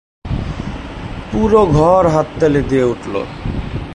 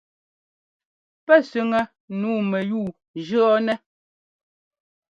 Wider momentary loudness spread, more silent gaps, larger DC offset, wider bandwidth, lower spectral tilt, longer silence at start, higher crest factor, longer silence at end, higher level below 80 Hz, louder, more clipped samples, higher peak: about the same, 15 LU vs 13 LU; second, none vs 2.00-2.08 s, 3.08-3.14 s; neither; first, 11 kHz vs 7.8 kHz; about the same, -7.5 dB/octave vs -7 dB/octave; second, 0.25 s vs 1.3 s; second, 14 dB vs 22 dB; second, 0 s vs 1.35 s; first, -28 dBFS vs -68 dBFS; first, -15 LUFS vs -22 LUFS; neither; about the same, 0 dBFS vs -2 dBFS